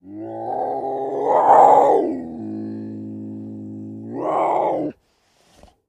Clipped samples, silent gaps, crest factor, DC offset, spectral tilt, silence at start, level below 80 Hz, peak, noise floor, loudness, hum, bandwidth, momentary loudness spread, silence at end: under 0.1%; none; 20 dB; under 0.1%; -7.5 dB/octave; 0.05 s; -64 dBFS; 0 dBFS; -61 dBFS; -18 LUFS; none; 8.6 kHz; 21 LU; 0.95 s